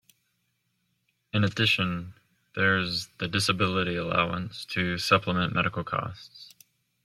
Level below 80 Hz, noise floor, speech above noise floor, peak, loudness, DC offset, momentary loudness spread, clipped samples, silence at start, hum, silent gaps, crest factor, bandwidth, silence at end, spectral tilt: -60 dBFS; -75 dBFS; 48 dB; -6 dBFS; -26 LUFS; under 0.1%; 13 LU; under 0.1%; 1.35 s; none; none; 22 dB; 15 kHz; 0.55 s; -4.5 dB/octave